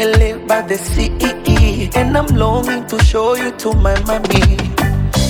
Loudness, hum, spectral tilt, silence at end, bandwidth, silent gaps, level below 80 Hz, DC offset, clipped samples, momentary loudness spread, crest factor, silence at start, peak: -15 LUFS; none; -5.5 dB/octave; 0 s; 19.5 kHz; none; -18 dBFS; under 0.1%; under 0.1%; 5 LU; 14 dB; 0 s; 0 dBFS